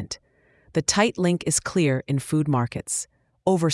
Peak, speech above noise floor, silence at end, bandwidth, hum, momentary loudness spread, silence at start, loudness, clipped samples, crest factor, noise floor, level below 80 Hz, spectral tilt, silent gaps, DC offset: -2 dBFS; 38 dB; 0 s; 12 kHz; none; 8 LU; 0 s; -23 LUFS; under 0.1%; 22 dB; -61 dBFS; -54 dBFS; -4.5 dB/octave; none; under 0.1%